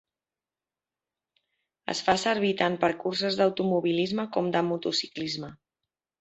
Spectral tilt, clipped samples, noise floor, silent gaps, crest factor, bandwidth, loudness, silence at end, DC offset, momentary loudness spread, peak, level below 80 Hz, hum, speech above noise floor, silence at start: -4.5 dB/octave; under 0.1%; under -90 dBFS; none; 22 dB; 8.2 kHz; -27 LUFS; 0.65 s; under 0.1%; 9 LU; -6 dBFS; -66 dBFS; none; over 63 dB; 1.9 s